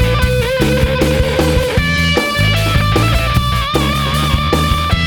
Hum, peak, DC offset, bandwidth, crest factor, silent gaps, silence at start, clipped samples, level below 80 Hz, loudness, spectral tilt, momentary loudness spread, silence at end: none; 0 dBFS; under 0.1%; over 20 kHz; 12 dB; none; 0 s; under 0.1%; -20 dBFS; -14 LUFS; -5 dB/octave; 2 LU; 0 s